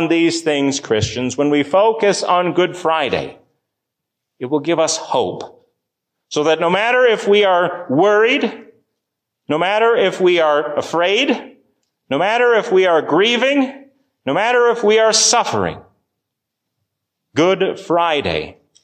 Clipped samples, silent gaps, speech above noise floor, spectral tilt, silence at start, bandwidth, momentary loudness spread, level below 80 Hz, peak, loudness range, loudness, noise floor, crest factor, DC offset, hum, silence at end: under 0.1%; none; 64 dB; -3.5 dB/octave; 0 s; 10 kHz; 10 LU; -50 dBFS; -2 dBFS; 5 LU; -15 LUFS; -79 dBFS; 14 dB; under 0.1%; none; 0.35 s